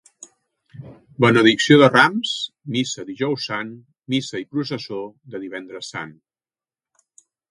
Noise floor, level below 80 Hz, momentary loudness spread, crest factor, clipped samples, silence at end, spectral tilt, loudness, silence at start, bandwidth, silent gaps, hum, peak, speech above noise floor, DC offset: under -90 dBFS; -64 dBFS; 20 LU; 22 dB; under 0.1%; 1.4 s; -5 dB/octave; -19 LUFS; 0.75 s; 11 kHz; none; none; 0 dBFS; over 71 dB; under 0.1%